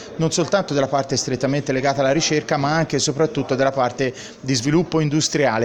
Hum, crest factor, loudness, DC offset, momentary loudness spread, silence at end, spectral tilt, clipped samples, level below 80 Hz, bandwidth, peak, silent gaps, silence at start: none; 16 dB; -20 LUFS; under 0.1%; 3 LU; 0 s; -4.5 dB/octave; under 0.1%; -52 dBFS; 11 kHz; -4 dBFS; none; 0 s